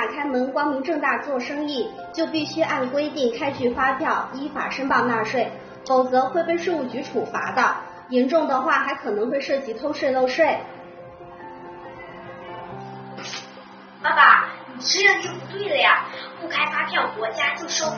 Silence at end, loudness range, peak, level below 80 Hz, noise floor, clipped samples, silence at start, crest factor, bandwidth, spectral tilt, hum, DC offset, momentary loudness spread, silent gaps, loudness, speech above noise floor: 0 s; 8 LU; 0 dBFS; -62 dBFS; -43 dBFS; under 0.1%; 0 s; 22 dB; 6.8 kHz; -1 dB/octave; none; under 0.1%; 20 LU; none; -21 LUFS; 21 dB